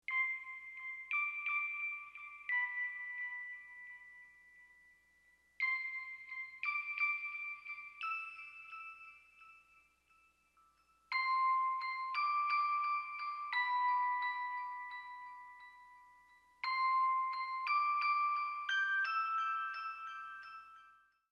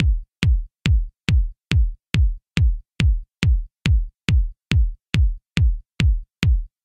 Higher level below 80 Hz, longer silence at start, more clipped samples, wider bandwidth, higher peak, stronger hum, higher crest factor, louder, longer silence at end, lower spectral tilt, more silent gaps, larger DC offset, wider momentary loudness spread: second, -86 dBFS vs -22 dBFS; about the same, 0.1 s vs 0 s; neither; about the same, 9.2 kHz vs 9.4 kHz; second, -26 dBFS vs -2 dBFS; neither; about the same, 14 dB vs 18 dB; second, -37 LUFS vs -22 LUFS; first, 0.4 s vs 0.2 s; second, 1.5 dB/octave vs -6 dB/octave; neither; neither; first, 17 LU vs 1 LU